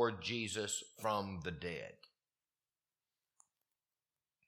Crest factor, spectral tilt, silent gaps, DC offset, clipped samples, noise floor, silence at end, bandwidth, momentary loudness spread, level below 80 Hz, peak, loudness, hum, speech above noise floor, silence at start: 24 dB; -3.5 dB/octave; none; under 0.1%; under 0.1%; under -90 dBFS; 2.55 s; 16 kHz; 7 LU; -70 dBFS; -20 dBFS; -40 LUFS; none; over 48 dB; 0 s